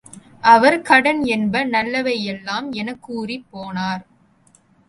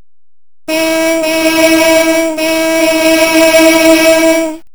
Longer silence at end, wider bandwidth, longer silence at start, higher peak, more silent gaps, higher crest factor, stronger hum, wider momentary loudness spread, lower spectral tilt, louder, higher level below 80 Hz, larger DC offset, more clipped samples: first, 0.85 s vs 0.15 s; second, 11.5 kHz vs over 20 kHz; second, 0.15 s vs 0.7 s; about the same, 0 dBFS vs 0 dBFS; neither; first, 20 dB vs 10 dB; neither; first, 16 LU vs 6 LU; first, -5 dB/octave vs -2 dB/octave; second, -18 LUFS vs -8 LUFS; second, -58 dBFS vs -42 dBFS; second, under 0.1% vs 2%; second, under 0.1% vs 1%